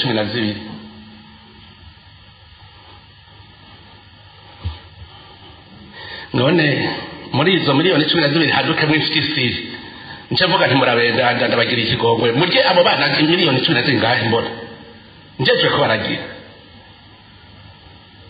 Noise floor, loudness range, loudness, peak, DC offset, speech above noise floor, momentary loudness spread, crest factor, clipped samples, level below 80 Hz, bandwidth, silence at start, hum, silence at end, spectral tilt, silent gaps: -44 dBFS; 9 LU; -15 LUFS; 0 dBFS; under 0.1%; 28 dB; 18 LU; 18 dB; under 0.1%; -50 dBFS; 5 kHz; 0 s; none; 0.05 s; -8 dB/octave; none